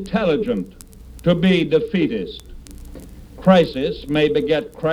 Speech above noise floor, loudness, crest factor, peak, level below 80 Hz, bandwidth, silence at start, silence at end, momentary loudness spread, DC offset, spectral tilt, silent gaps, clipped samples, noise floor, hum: 20 dB; -19 LUFS; 18 dB; 0 dBFS; -40 dBFS; 13.5 kHz; 0 s; 0 s; 22 LU; under 0.1%; -7 dB/octave; none; under 0.1%; -38 dBFS; none